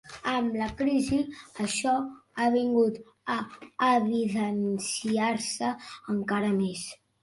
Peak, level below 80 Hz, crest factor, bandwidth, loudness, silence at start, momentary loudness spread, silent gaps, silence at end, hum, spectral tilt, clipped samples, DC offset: -12 dBFS; -60 dBFS; 16 dB; 11.5 kHz; -28 LUFS; 0.05 s; 10 LU; none; 0.25 s; none; -4.5 dB/octave; under 0.1%; under 0.1%